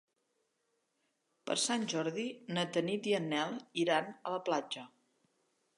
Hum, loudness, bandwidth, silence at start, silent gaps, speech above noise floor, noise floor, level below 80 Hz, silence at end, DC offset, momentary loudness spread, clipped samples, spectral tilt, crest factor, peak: none; -35 LUFS; 11.5 kHz; 1.45 s; none; 46 dB; -81 dBFS; -88 dBFS; 0.9 s; under 0.1%; 8 LU; under 0.1%; -3.5 dB/octave; 22 dB; -16 dBFS